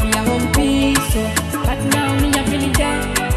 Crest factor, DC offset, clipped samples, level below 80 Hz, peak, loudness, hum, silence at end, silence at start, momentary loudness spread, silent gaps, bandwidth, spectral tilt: 16 dB; under 0.1%; under 0.1%; -26 dBFS; 0 dBFS; -17 LUFS; none; 0 s; 0 s; 4 LU; none; 15 kHz; -4.5 dB/octave